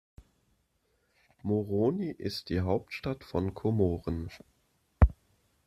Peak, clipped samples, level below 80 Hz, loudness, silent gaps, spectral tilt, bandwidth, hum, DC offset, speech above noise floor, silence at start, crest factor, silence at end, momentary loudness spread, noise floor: -6 dBFS; under 0.1%; -38 dBFS; -31 LUFS; none; -8 dB/octave; 13.5 kHz; none; under 0.1%; 43 dB; 1.45 s; 26 dB; 0.55 s; 10 LU; -74 dBFS